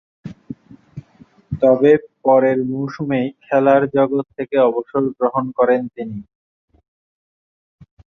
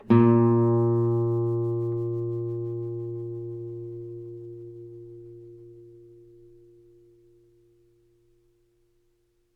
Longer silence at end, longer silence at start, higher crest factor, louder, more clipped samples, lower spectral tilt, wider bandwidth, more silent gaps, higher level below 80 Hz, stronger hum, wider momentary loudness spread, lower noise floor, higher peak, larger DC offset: second, 1.9 s vs 3.65 s; first, 0.25 s vs 0.05 s; about the same, 18 dB vs 22 dB; first, -17 LUFS vs -25 LUFS; neither; second, -9 dB/octave vs -12 dB/octave; first, 6.2 kHz vs 4 kHz; neither; first, -54 dBFS vs -62 dBFS; neither; about the same, 23 LU vs 25 LU; second, -49 dBFS vs -68 dBFS; first, -2 dBFS vs -6 dBFS; neither